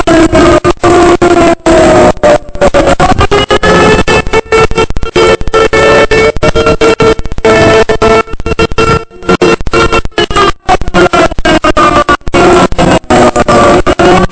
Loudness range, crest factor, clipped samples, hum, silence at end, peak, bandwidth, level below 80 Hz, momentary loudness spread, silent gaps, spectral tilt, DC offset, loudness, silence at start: 2 LU; 6 dB; 8%; none; 0 s; 0 dBFS; 8 kHz; -20 dBFS; 5 LU; none; -5 dB/octave; under 0.1%; -6 LUFS; 0 s